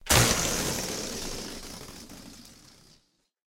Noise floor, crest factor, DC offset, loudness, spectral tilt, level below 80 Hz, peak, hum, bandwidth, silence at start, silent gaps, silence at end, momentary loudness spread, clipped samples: -66 dBFS; 26 dB; under 0.1%; -27 LUFS; -2.5 dB/octave; -42 dBFS; -4 dBFS; none; 16.5 kHz; 0.05 s; none; 1 s; 24 LU; under 0.1%